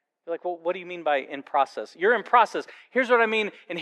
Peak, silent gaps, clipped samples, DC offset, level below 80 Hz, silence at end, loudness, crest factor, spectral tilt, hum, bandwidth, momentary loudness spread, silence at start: -4 dBFS; none; under 0.1%; under 0.1%; under -90 dBFS; 0 s; -25 LUFS; 20 dB; -4 dB/octave; none; 10.5 kHz; 11 LU; 0.25 s